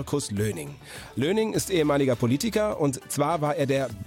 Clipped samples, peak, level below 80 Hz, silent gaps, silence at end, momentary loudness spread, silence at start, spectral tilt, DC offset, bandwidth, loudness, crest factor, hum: under 0.1%; -10 dBFS; -52 dBFS; none; 0 s; 9 LU; 0 s; -5.5 dB/octave; under 0.1%; 16.5 kHz; -25 LUFS; 14 dB; none